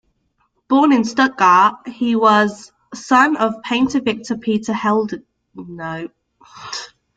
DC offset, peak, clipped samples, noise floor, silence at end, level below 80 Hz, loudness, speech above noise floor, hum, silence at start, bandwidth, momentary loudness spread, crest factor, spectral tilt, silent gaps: under 0.1%; -2 dBFS; under 0.1%; -65 dBFS; 0.3 s; -58 dBFS; -16 LUFS; 49 dB; none; 0.7 s; 9.2 kHz; 21 LU; 16 dB; -4.5 dB/octave; none